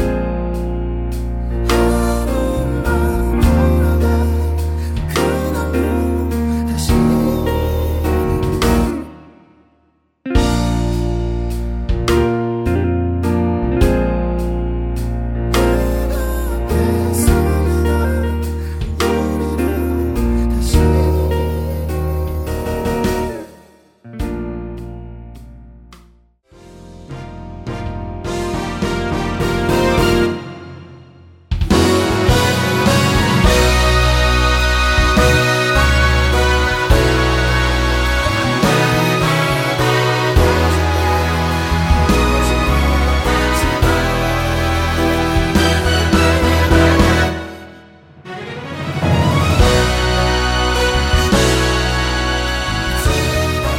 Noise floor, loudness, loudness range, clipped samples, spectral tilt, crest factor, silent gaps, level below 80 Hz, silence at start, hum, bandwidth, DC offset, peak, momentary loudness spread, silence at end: -59 dBFS; -16 LUFS; 9 LU; under 0.1%; -5.5 dB/octave; 16 dB; none; -20 dBFS; 0 s; none; 17 kHz; under 0.1%; 0 dBFS; 10 LU; 0 s